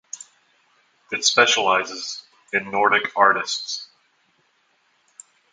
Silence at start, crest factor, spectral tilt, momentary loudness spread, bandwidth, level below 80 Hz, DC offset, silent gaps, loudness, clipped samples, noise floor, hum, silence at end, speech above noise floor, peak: 0.15 s; 24 dB; -0.5 dB/octave; 16 LU; 10.5 kHz; -72 dBFS; under 0.1%; none; -20 LUFS; under 0.1%; -65 dBFS; none; 1.7 s; 44 dB; 0 dBFS